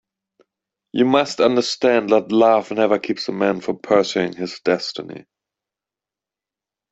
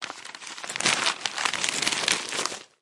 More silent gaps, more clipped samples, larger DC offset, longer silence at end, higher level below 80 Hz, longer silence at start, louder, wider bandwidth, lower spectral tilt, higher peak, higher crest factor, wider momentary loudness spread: neither; neither; neither; first, 1.75 s vs 0.15 s; first, -64 dBFS vs -70 dBFS; first, 0.95 s vs 0 s; first, -19 LUFS vs -25 LUFS; second, 8.2 kHz vs 11.5 kHz; first, -5 dB/octave vs 0 dB/octave; about the same, -2 dBFS vs -2 dBFS; second, 18 dB vs 26 dB; second, 11 LU vs 14 LU